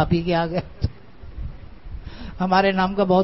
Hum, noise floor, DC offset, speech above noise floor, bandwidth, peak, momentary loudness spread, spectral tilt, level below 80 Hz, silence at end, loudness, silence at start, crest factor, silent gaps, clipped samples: none; -41 dBFS; 0.7%; 21 dB; 6 kHz; -4 dBFS; 21 LU; -8.5 dB/octave; -38 dBFS; 0 s; -21 LUFS; 0 s; 18 dB; none; under 0.1%